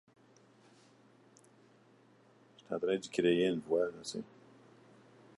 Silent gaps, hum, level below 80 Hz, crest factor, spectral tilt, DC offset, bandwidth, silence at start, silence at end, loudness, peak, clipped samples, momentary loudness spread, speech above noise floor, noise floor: none; none; -78 dBFS; 22 dB; -5 dB/octave; under 0.1%; 11.5 kHz; 2.7 s; 1.15 s; -34 LUFS; -16 dBFS; under 0.1%; 14 LU; 31 dB; -65 dBFS